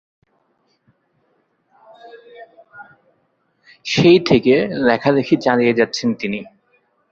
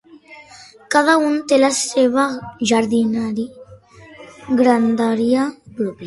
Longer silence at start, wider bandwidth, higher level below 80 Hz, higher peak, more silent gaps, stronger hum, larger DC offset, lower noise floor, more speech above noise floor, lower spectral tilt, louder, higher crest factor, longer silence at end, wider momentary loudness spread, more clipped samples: first, 2.05 s vs 0.15 s; second, 7.6 kHz vs 11.5 kHz; about the same, -56 dBFS vs -58 dBFS; about the same, -2 dBFS vs 0 dBFS; neither; neither; neither; first, -65 dBFS vs -43 dBFS; first, 49 dB vs 27 dB; first, -6 dB/octave vs -4 dB/octave; about the same, -16 LUFS vs -17 LUFS; about the same, 18 dB vs 18 dB; first, 0.65 s vs 0 s; about the same, 12 LU vs 11 LU; neither